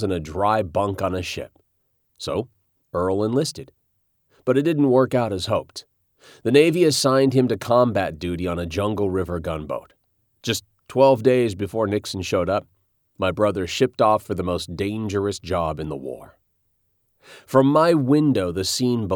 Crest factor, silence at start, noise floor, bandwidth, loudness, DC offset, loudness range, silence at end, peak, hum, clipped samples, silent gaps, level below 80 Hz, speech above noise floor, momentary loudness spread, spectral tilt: 18 dB; 0 s; -69 dBFS; 19 kHz; -21 LUFS; under 0.1%; 7 LU; 0 s; -4 dBFS; none; under 0.1%; none; -50 dBFS; 49 dB; 13 LU; -5.5 dB/octave